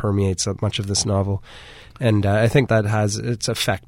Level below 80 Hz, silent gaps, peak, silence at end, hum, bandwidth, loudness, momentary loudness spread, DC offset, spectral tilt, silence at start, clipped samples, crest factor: -46 dBFS; none; -4 dBFS; 0.1 s; none; 16 kHz; -20 LUFS; 8 LU; under 0.1%; -5 dB/octave; 0 s; under 0.1%; 16 dB